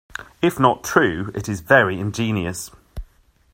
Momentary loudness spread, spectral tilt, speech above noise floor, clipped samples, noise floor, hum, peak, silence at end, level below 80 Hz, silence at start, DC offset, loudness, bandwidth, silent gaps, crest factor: 21 LU; -5 dB/octave; 35 dB; under 0.1%; -55 dBFS; none; 0 dBFS; 0.5 s; -44 dBFS; 0.2 s; under 0.1%; -19 LUFS; 16 kHz; none; 20 dB